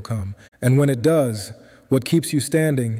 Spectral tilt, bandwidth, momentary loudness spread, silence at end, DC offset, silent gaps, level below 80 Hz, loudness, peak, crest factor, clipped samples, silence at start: -6.5 dB/octave; 16 kHz; 13 LU; 0 s; under 0.1%; 0.48-0.52 s; -56 dBFS; -20 LUFS; -6 dBFS; 14 dB; under 0.1%; 0 s